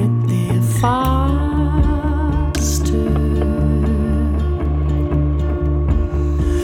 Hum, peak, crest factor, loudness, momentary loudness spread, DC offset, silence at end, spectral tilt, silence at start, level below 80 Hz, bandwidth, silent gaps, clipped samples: none; -2 dBFS; 14 dB; -18 LUFS; 3 LU; under 0.1%; 0 s; -7 dB/octave; 0 s; -20 dBFS; 15.5 kHz; none; under 0.1%